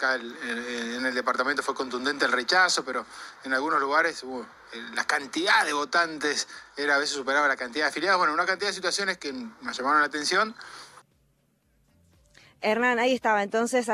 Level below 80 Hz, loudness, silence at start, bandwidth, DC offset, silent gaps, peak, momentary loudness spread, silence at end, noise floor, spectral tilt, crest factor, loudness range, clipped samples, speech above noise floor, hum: -70 dBFS; -25 LUFS; 0 s; 15 kHz; under 0.1%; none; -8 dBFS; 13 LU; 0 s; -68 dBFS; -1.5 dB/octave; 20 dB; 4 LU; under 0.1%; 42 dB; none